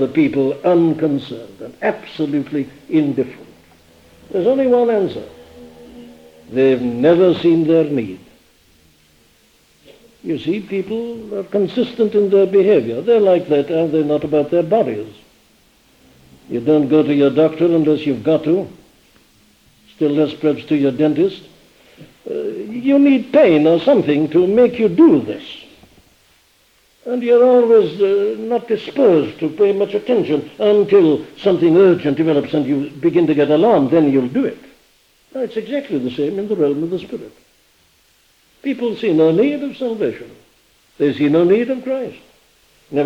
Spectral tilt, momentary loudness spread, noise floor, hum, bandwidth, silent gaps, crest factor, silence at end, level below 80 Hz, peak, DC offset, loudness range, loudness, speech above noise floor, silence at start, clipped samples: -8 dB/octave; 13 LU; -56 dBFS; none; 8 kHz; none; 16 dB; 0 s; -58 dBFS; 0 dBFS; under 0.1%; 7 LU; -16 LUFS; 41 dB; 0 s; under 0.1%